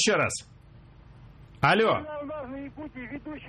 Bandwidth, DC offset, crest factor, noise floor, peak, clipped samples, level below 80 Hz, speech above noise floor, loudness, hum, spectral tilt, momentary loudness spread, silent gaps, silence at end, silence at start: 13 kHz; under 0.1%; 20 dB; -51 dBFS; -8 dBFS; under 0.1%; -54 dBFS; 24 dB; -27 LUFS; none; -3.5 dB/octave; 17 LU; none; 0 s; 0 s